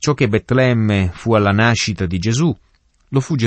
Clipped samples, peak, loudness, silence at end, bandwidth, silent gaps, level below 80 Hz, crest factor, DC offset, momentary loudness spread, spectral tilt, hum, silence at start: under 0.1%; -2 dBFS; -16 LUFS; 0 s; 8.6 kHz; none; -42 dBFS; 14 dB; under 0.1%; 6 LU; -5.5 dB/octave; none; 0 s